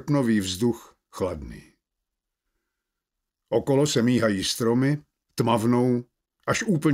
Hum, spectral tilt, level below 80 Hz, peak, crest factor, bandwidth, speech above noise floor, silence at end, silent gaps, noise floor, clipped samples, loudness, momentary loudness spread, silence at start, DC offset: none; -5.5 dB/octave; -54 dBFS; -8 dBFS; 18 dB; 16 kHz; 61 dB; 0 s; none; -84 dBFS; under 0.1%; -24 LUFS; 14 LU; 0.05 s; under 0.1%